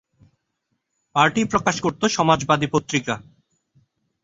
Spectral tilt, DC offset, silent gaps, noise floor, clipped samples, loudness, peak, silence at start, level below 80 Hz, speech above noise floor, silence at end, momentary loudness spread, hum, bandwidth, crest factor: -4.5 dB/octave; under 0.1%; none; -75 dBFS; under 0.1%; -20 LUFS; -2 dBFS; 1.15 s; -56 dBFS; 55 dB; 1 s; 8 LU; none; 8 kHz; 22 dB